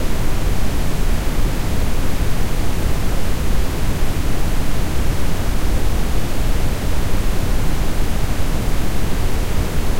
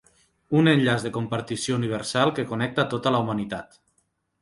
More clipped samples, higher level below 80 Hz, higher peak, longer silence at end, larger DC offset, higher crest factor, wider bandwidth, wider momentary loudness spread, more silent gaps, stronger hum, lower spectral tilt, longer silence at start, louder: neither; first, -18 dBFS vs -60 dBFS; about the same, -6 dBFS vs -6 dBFS; second, 0 s vs 0.75 s; neither; second, 8 dB vs 20 dB; first, 16 kHz vs 11.5 kHz; second, 1 LU vs 10 LU; neither; neither; about the same, -5.5 dB/octave vs -5.5 dB/octave; second, 0 s vs 0.5 s; about the same, -22 LUFS vs -24 LUFS